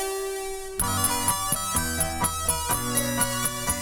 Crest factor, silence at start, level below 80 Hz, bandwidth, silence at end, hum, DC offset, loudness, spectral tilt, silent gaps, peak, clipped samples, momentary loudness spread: 18 dB; 0 s; -40 dBFS; over 20 kHz; 0 s; none; 0.2%; -25 LUFS; -2.5 dB/octave; none; -10 dBFS; under 0.1%; 7 LU